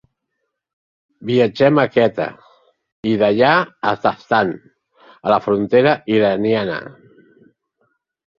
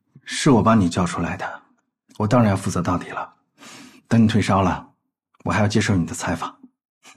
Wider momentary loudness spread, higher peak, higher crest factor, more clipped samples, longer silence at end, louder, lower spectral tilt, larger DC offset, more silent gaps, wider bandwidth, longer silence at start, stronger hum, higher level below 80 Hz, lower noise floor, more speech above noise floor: second, 12 LU vs 15 LU; about the same, -2 dBFS vs -4 dBFS; about the same, 18 dB vs 18 dB; neither; first, 1.45 s vs 0.65 s; first, -17 LUFS vs -20 LUFS; first, -7.5 dB/octave vs -6 dB/octave; neither; first, 2.92-3.03 s vs none; second, 7.2 kHz vs 13 kHz; first, 1.2 s vs 0.25 s; neither; second, -58 dBFS vs -48 dBFS; first, -75 dBFS vs -66 dBFS; first, 59 dB vs 47 dB